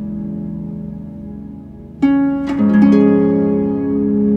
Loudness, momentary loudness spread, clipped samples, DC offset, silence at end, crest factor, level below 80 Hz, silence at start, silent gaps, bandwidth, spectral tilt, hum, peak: -15 LUFS; 20 LU; under 0.1%; under 0.1%; 0 s; 14 dB; -42 dBFS; 0 s; none; 5.4 kHz; -10 dB/octave; none; -2 dBFS